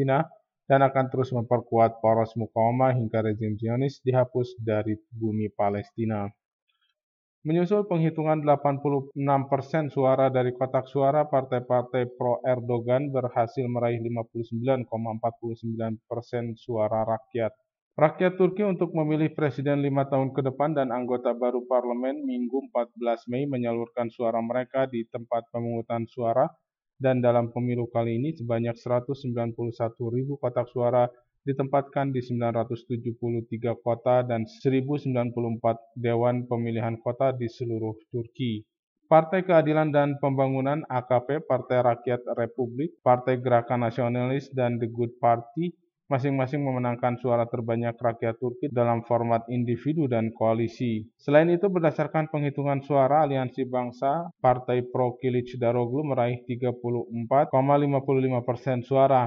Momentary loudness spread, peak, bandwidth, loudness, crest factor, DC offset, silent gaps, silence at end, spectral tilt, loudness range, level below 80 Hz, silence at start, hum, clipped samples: 8 LU; -6 dBFS; 6.6 kHz; -26 LUFS; 20 dB; under 0.1%; 6.45-6.67 s, 7.03-7.42 s, 17.82-17.91 s, 38.79-38.96 s; 0 s; -9.5 dB/octave; 4 LU; -70 dBFS; 0 s; none; under 0.1%